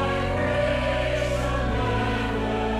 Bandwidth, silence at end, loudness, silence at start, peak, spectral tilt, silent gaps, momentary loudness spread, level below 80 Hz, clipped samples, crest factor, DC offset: 13.5 kHz; 0 s; -25 LUFS; 0 s; -12 dBFS; -6 dB/octave; none; 2 LU; -32 dBFS; under 0.1%; 12 dB; under 0.1%